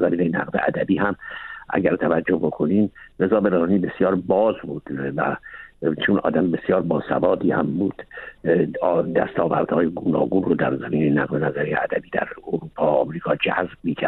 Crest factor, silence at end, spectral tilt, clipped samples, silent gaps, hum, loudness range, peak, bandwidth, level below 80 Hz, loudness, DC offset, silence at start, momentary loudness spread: 16 dB; 0 s; -10 dB/octave; under 0.1%; none; none; 1 LU; -6 dBFS; 4.2 kHz; -54 dBFS; -22 LUFS; under 0.1%; 0 s; 8 LU